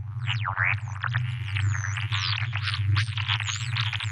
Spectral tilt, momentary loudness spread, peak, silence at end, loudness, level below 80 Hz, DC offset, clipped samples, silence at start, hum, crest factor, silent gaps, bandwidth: -3 dB/octave; 4 LU; -12 dBFS; 0 s; -27 LUFS; -56 dBFS; under 0.1%; under 0.1%; 0 s; none; 16 dB; none; 10 kHz